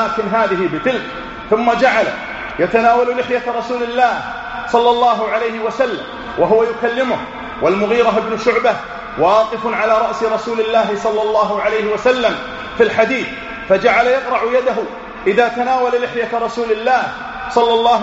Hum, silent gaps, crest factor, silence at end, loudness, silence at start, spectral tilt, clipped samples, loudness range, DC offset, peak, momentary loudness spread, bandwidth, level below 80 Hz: none; none; 16 dB; 0 s; -16 LUFS; 0 s; -2.5 dB/octave; under 0.1%; 1 LU; under 0.1%; 0 dBFS; 10 LU; 8 kHz; -46 dBFS